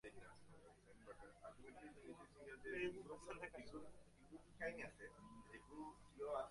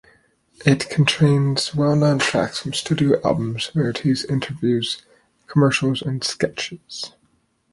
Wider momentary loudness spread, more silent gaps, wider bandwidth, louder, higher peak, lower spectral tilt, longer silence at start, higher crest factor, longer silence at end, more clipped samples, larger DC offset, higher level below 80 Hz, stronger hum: first, 16 LU vs 11 LU; neither; about the same, 11.5 kHz vs 11.5 kHz; second, -55 LUFS vs -20 LUFS; second, -34 dBFS vs -2 dBFS; about the same, -5 dB/octave vs -5.5 dB/octave; second, 0.05 s vs 0.6 s; about the same, 22 dB vs 18 dB; second, 0 s vs 0.65 s; neither; neither; second, -74 dBFS vs -54 dBFS; neither